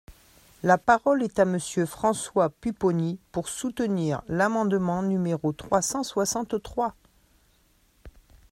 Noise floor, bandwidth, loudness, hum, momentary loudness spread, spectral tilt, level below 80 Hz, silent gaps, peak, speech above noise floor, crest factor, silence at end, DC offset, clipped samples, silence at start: -63 dBFS; 16 kHz; -26 LUFS; none; 8 LU; -5 dB/octave; -56 dBFS; none; -6 dBFS; 38 dB; 20 dB; 0.45 s; under 0.1%; under 0.1%; 0.1 s